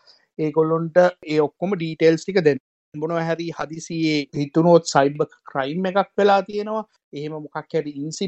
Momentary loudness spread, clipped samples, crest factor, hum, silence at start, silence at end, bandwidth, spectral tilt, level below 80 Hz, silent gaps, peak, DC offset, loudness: 13 LU; under 0.1%; 20 dB; none; 0.4 s; 0 s; 8.6 kHz; -6 dB/octave; -66 dBFS; 2.60-2.92 s, 7.04-7.12 s; -2 dBFS; under 0.1%; -21 LUFS